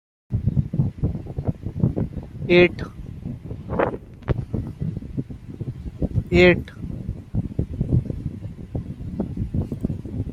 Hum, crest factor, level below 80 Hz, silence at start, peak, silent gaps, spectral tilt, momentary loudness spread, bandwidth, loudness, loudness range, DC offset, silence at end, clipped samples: none; 22 dB; -36 dBFS; 0.3 s; -2 dBFS; none; -8.5 dB/octave; 17 LU; 7.6 kHz; -24 LUFS; 5 LU; under 0.1%; 0 s; under 0.1%